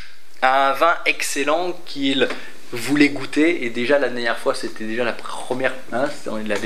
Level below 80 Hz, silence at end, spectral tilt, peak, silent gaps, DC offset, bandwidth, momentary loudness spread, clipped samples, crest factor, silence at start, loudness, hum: -70 dBFS; 0 s; -3.5 dB/octave; 0 dBFS; none; 5%; 15 kHz; 11 LU; under 0.1%; 20 dB; 0 s; -20 LUFS; none